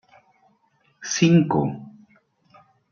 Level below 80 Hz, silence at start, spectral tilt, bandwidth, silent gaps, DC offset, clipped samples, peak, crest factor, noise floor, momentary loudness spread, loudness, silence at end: -62 dBFS; 1 s; -5.5 dB/octave; 7.2 kHz; none; under 0.1%; under 0.1%; -6 dBFS; 20 dB; -64 dBFS; 20 LU; -20 LUFS; 1 s